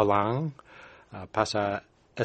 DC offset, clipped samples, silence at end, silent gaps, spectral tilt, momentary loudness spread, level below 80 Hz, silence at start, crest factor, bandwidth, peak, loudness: under 0.1%; under 0.1%; 0 s; none; -6 dB/octave; 23 LU; -60 dBFS; 0 s; 22 dB; 8.4 kHz; -6 dBFS; -29 LUFS